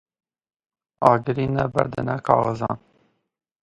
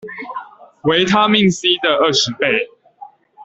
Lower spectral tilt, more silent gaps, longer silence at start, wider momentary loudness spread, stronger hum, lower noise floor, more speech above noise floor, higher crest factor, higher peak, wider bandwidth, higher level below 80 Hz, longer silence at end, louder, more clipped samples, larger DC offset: first, -8.5 dB/octave vs -4 dB/octave; neither; first, 1 s vs 0.05 s; second, 9 LU vs 16 LU; neither; first, -64 dBFS vs -41 dBFS; first, 43 dB vs 26 dB; first, 24 dB vs 16 dB; about the same, 0 dBFS vs -2 dBFS; first, 11 kHz vs 8.2 kHz; about the same, -52 dBFS vs -54 dBFS; first, 0.85 s vs 0 s; second, -22 LUFS vs -14 LUFS; neither; neither